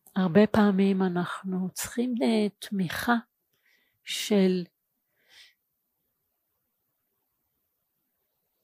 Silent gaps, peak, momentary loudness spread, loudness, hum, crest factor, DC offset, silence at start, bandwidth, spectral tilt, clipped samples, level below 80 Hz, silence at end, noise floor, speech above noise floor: none; -6 dBFS; 10 LU; -26 LUFS; none; 22 dB; under 0.1%; 0.15 s; 15.5 kHz; -5.5 dB/octave; under 0.1%; -64 dBFS; 4 s; -79 dBFS; 53 dB